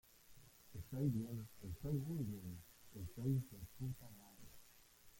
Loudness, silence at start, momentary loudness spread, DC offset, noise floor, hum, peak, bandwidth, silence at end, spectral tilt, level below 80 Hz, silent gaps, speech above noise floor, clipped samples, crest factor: -46 LUFS; 0.05 s; 23 LU; under 0.1%; -66 dBFS; none; -28 dBFS; 17 kHz; 0 s; -7.5 dB/octave; -64 dBFS; none; 22 dB; under 0.1%; 18 dB